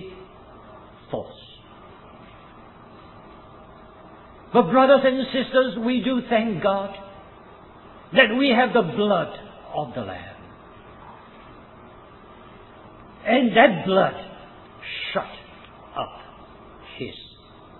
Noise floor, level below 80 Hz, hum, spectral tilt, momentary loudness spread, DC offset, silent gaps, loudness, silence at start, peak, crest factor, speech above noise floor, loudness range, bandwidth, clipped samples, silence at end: -47 dBFS; -56 dBFS; none; -9 dB/octave; 26 LU; under 0.1%; none; -21 LUFS; 0 s; 0 dBFS; 24 dB; 27 dB; 19 LU; 4.3 kHz; under 0.1%; 0.55 s